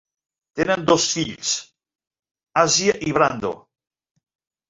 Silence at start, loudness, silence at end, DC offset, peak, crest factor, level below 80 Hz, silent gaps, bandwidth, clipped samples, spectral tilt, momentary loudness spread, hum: 0.55 s; -20 LUFS; 1.1 s; under 0.1%; -2 dBFS; 22 dB; -56 dBFS; none; 7.8 kHz; under 0.1%; -3 dB/octave; 12 LU; none